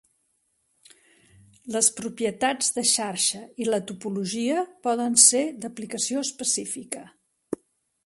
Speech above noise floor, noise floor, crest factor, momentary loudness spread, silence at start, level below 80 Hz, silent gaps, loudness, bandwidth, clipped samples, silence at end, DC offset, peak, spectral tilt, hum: 47 dB; -72 dBFS; 26 dB; 20 LU; 1.65 s; -70 dBFS; none; -23 LUFS; 12 kHz; under 0.1%; 0.5 s; under 0.1%; -2 dBFS; -1.5 dB/octave; none